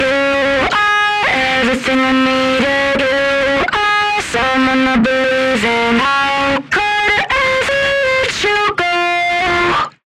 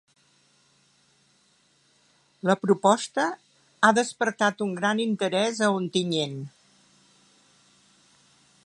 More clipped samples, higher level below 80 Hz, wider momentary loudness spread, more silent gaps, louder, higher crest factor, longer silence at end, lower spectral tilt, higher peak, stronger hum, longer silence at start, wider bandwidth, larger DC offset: neither; first, -40 dBFS vs -78 dBFS; second, 2 LU vs 9 LU; neither; first, -13 LUFS vs -24 LUFS; second, 8 dB vs 24 dB; second, 0.2 s vs 2.15 s; about the same, -3.5 dB/octave vs -4.5 dB/octave; about the same, -6 dBFS vs -4 dBFS; neither; second, 0 s vs 2.45 s; first, 13.5 kHz vs 11.5 kHz; neither